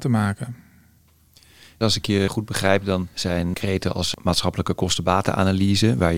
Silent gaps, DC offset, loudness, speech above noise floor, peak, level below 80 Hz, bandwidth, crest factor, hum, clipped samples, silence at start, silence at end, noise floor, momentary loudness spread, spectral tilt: none; 0.6%; -22 LUFS; 35 dB; -2 dBFS; -48 dBFS; 16.5 kHz; 20 dB; none; under 0.1%; 0 s; 0 s; -56 dBFS; 6 LU; -5 dB/octave